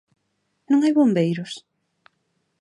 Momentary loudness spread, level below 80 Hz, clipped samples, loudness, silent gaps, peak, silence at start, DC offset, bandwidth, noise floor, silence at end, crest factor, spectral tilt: 17 LU; -76 dBFS; under 0.1%; -20 LUFS; none; -8 dBFS; 0.7 s; under 0.1%; 10.5 kHz; -73 dBFS; 1 s; 16 dB; -7 dB/octave